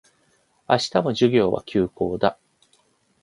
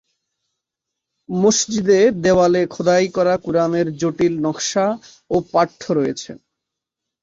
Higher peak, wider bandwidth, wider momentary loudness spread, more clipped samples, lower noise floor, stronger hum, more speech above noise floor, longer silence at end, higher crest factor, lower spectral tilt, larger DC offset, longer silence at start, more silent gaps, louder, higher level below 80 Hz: about the same, -2 dBFS vs -4 dBFS; first, 11 kHz vs 8 kHz; about the same, 6 LU vs 8 LU; neither; second, -64 dBFS vs -83 dBFS; neither; second, 43 dB vs 65 dB; about the same, 0.9 s vs 0.85 s; first, 22 dB vs 16 dB; first, -6 dB/octave vs -4.5 dB/octave; neither; second, 0.7 s vs 1.3 s; neither; second, -22 LUFS vs -18 LUFS; about the same, -54 dBFS vs -54 dBFS